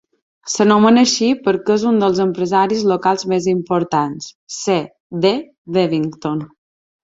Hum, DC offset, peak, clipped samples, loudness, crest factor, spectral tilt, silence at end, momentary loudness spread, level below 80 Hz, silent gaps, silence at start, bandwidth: none; under 0.1%; -2 dBFS; under 0.1%; -16 LUFS; 16 dB; -5 dB/octave; 0.75 s; 12 LU; -58 dBFS; 4.35-4.47 s, 5.00-5.10 s, 5.58-5.65 s; 0.45 s; 8 kHz